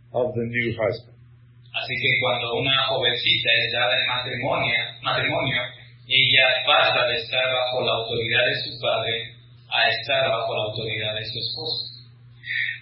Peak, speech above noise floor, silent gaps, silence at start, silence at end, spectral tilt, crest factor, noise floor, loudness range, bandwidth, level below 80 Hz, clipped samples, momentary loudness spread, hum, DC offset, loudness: -2 dBFS; 27 dB; none; 0.15 s; 0 s; -8.5 dB/octave; 22 dB; -49 dBFS; 5 LU; 5.8 kHz; -58 dBFS; under 0.1%; 10 LU; none; under 0.1%; -21 LUFS